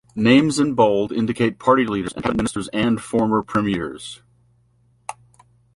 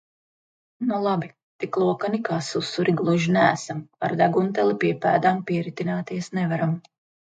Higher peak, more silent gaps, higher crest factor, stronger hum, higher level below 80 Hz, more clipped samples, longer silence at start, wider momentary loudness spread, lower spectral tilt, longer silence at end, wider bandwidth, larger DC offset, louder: about the same, -2 dBFS vs -4 dBFS; second, none vs 1.43-1.59 s; about the same, 18 dB vs 20 dB; neither; first, -48 dBFS vs -68 dBFS; neither; second, 0.15 s vs 0.8 s; first, 20 LU vs 9 LU; about the same, -5.5 dB/octave vs -6.5 dB/octave; first, 0.65 s vs 0.45 s; first, 11.5 kHz vs 9.2 kHz; neither; first, -19 LUFS vs -23 LUFS